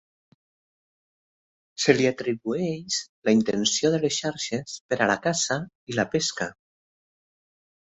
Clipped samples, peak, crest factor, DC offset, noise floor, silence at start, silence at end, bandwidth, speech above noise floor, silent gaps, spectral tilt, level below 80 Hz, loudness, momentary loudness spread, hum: under 0.1%; -2 dBFS; 24 dB; under 0.1%; under -90 dBFS; 1.8 s; 1.45 s; 8.4 kHz; over 65 dB; 3.09-3.22 s, 4.80-4.89 s, 5.75-5.87 s; -3.5 dB/octave; -64 dBFS; -25 LUFS; 9 LU; none